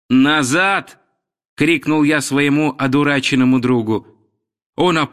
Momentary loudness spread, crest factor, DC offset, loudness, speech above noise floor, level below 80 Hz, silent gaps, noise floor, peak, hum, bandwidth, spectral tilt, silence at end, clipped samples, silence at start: 6 LU; 14 dB; under 0.1%; -15 LUFS; 49 dB; -56 dBFS; 1.45-1.57 s, 4.66-4.73 s; -64 dBFS; -4 dBFS; none; 14.5 kHz; -5 dB/octave; 0.05 s; under 0.1%; 0.1 s